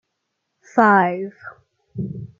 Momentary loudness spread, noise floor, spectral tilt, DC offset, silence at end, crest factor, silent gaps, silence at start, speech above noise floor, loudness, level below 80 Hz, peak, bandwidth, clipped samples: 18 LU; -76 dBFS; -8 dB/octave; under 0.1%; 0.15 s; 22 dB; none; 0.75 s; 58 dB; -18 LUFS; -60 dBFS; 0 dBFS; 7.4 kHz; under 0.1%